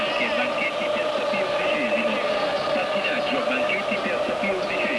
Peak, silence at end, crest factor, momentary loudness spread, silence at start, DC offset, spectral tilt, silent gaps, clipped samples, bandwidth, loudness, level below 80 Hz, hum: -12 dBFS; 0 s; 12 dB; 2 LU; 0 s; under 0.1%; -4 dB/octave; none; under 0.1%; 11 kHz; -23 LUFS; -60 dBFS; none